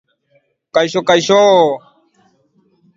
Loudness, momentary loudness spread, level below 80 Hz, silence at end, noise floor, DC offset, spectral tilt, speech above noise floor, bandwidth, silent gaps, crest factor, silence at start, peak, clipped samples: -12 LUFS; 9 LU; -60 dBFS; 1.2 s; -59 dBFS; under 0.1%; -4 dB/octave; 48 dB; 7.8 kHz; none; 16 dB; 0.75 s; 0 dBFS; under 0.1%